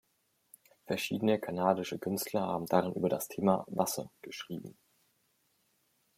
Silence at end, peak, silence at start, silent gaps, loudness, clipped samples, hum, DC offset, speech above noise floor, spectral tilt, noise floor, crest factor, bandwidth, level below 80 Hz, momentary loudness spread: 1.45 s; -12 dBFS; 0.85 s; none; -33 LUFS; under 0.1%; none; under 0.1%; 43 dB; -5 dB/octave; -76 dBFS; 24 dB; 16.5 kHz; -74 dBFS; 13 LU